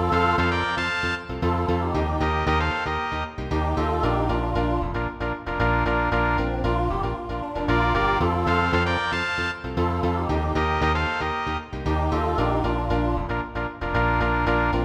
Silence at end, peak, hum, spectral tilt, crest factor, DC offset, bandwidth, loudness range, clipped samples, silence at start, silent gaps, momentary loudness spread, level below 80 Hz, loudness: 0 s; -8 dBFS; none; -7 dB/octave; 16 dB; under 0.1%; 10 kHz; 2 LU; under 0.1%; 0 s; none; 7 LU; -32 dBFS; -24 LUFS